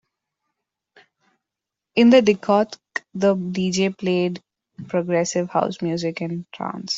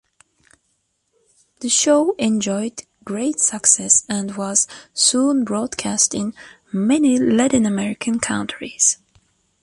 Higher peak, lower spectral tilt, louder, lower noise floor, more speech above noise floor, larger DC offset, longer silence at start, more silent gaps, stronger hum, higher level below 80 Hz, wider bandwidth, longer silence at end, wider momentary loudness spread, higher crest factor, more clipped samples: second, -4 dBFS vs 0 dBFS; first, -5.5 dB/octave vs -3 dB/octave; second, -21 LUFS vs -18 LUFS; first, -86 dBFS vs -69 dBFS; first, 66 dB vs 50 dB; neither; first, 1.95 s vs 1.6 s; neither; neither; second, -64 dBFS vs -56 dBFS; second, 8 kHz vs 11.5 kHz; second, 0 s vs 0.7 s; about the same, 15 LU vs 13 LU; about the same, 18 dB vs 20 dB; neither